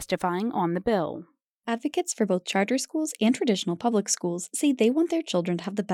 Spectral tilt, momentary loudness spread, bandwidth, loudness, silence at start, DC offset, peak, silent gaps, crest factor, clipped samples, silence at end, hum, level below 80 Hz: -4.5 dB/octave; 7 LU; 17 kHz; -26 LUFS; 0 s; under 0.1%; -12 dBFS; 1.50-1.60 s; 14 dB; under 0.1%; 0 s; none; -64 dBFS